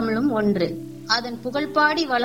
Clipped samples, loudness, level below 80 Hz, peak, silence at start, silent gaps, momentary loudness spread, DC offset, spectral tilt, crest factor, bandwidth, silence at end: under 0.1%; -22 LUFS; -56 dBFS; -6 dBFS; 0 s; none; 8 LU; 0.3%; -5 dB/octave; 16 dB; 17 kHz; 0 s